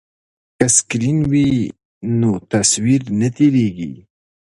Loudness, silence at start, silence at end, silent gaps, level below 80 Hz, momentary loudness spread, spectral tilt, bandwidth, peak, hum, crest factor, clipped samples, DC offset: -16 LUFS; 0.6 s; 0.65 s; 1.85-2.01 s; -46 dBFS; 11 LU; -4.5 dB/octave; 11.5 kHz; 0 dBFS; none; 18 dB; under 0.1%; under 0.1%